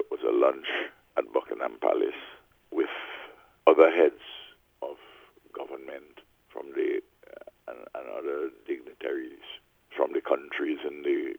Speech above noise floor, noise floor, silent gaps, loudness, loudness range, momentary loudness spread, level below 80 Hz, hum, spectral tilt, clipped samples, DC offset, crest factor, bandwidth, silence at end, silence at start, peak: 32 dB; -56 dBFS; none; -28 LUFS; 12 LU; 20 LU; -74 dBFS; none; -5 dB/octave; under 0.1%; under 0.1%; 26 dB; over 20 kHz; 0 s; 0 s; -4 dBFS